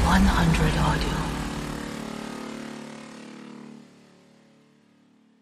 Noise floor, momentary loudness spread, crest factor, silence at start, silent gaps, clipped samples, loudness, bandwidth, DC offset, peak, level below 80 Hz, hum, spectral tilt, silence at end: -59 dBFS; 22 LU; 22 dB; 0 s; none; under 0.1%; -26 LUFS; 15.5 kHz; under 0.1%; -6 dBFS; -32 dBFS; none; -5.5 dB/octave; 1.6 s